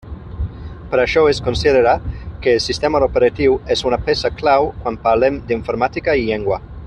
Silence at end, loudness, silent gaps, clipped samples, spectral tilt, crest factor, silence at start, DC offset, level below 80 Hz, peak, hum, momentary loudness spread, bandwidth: 0 s; -16 LUFS; none; under 0.1%; -5.5 dB/octave; 16 dB; 0.05 s; under 0.1%; -34 dBFS; -2 dBFS; none; 11 LU; 10 kHz